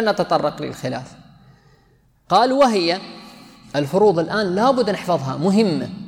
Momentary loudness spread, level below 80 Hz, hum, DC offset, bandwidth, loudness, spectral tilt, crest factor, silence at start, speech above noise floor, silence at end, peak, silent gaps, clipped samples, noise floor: 12 LU; -58 dBFS; none; under 0.1%; 16 kHz; -19 LUFS; -6 dB/octave; 16 dB; 0 s; 38 dB; 0 s; -4 dBFS; none; under 0.1%; -57 dBFS